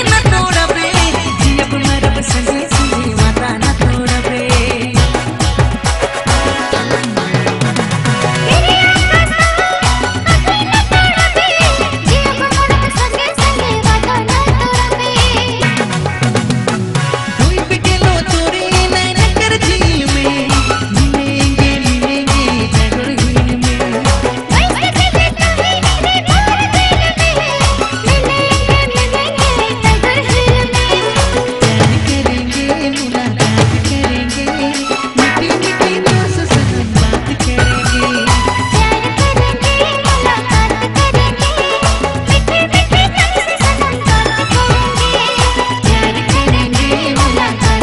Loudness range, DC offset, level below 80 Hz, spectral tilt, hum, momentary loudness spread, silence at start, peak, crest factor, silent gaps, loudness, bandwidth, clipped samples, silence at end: 2 LU; under 0.1%; -20 dBFS; -4.5 dB/octave; none; 4 LU; 0 s; 0 dBFS; 12 dB; none; -12 LUFS; 12 kHz; under 0.1%; 0 s